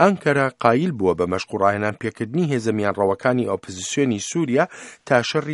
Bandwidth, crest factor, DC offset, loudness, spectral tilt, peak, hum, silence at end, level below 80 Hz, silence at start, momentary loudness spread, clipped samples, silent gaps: 11.5 kHz; 20 dB; under 0.1%; -21 LUFS; -5.5 dB/octave; 0 dBFS; none; 0 s; -58 dBFS; 0 s; 7 LU; under 0.1%; none